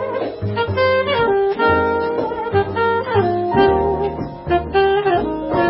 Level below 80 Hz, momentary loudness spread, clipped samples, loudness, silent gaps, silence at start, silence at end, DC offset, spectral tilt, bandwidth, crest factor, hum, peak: -36 dBFS; 6 LU; under 0.1%; -18 LUFS; none; 0 s; 0 s; under 0.1%; -11.5 dB/octave; 5.8 kHz; 16 dB; none; -2 dBFS